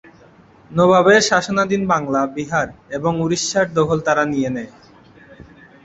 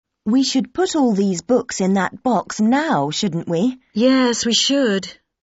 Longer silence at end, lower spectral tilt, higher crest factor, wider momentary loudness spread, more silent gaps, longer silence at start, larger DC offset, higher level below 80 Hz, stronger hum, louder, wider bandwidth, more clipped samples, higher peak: first, 0.5 s vs 0.3 s; about the same, -4.5 dB/octave vs -4 dB/octave; about the same, 16 dB vs 14 dB; first, 12 LU vs 5 LU; neither; first, 0.7 s vs 0.25 s; neither; first, -52 dBFS vs -58 dBFS; neither; about the same, -17 LUFS vs -18 LUFS; about the same, 8.2 kHz vs 8 kHz; neither; about the same, -2 dBFS vs -4 dBFS